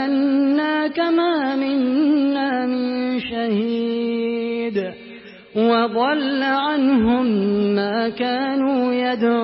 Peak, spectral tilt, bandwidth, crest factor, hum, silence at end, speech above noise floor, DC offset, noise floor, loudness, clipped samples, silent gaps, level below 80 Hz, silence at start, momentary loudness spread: -6 dBFS; -10.5 dB/octave; 5.8 kHz; 14 dB; none; 0 s; 22 dB; under 0.1%; -40 dBFS; -20 LUFS; under 0.1%; none; -54 dBFS; 0 s; 6 LU